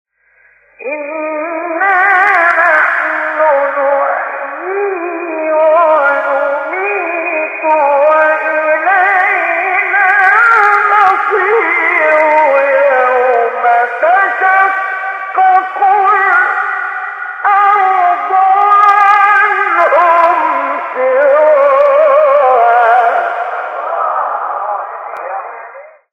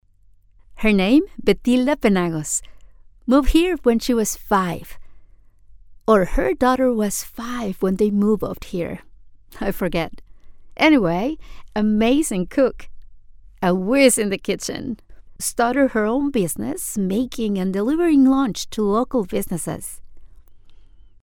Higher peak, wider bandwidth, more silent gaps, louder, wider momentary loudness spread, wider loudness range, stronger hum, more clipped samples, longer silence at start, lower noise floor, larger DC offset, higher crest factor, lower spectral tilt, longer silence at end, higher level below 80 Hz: about the same, 0 dBFS vs -2 dBFS; second, 8.8 kHz vs 19 kHz; neither; first, -10 LUFS vs -20 LUFS; about the same, 11 LU vs 12 LU; about the same, 4 LU vs 3 LU; neither; neither; about the same, 0.8 s vs 0.7 s; about the same, -50 dBFS vs -52 dBFS; neither; second, 10 dB vs 18 dB; second, -3 dB/octave vs -5 dB/octave; about the same, 0.25 s vs 0.3 s; second, -66 dBFS vs -36 dBFS